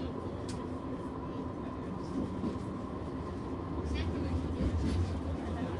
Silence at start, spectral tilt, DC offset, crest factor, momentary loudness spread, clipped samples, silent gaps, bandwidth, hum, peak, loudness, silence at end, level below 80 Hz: 0 s; -7.5 dB/octave; under 0.1%; 14 dB; 6 LU; under 0.1%; none; 11 kHz; none; -20 dBFS; -37 LUFS; 0 s; -44 dBFS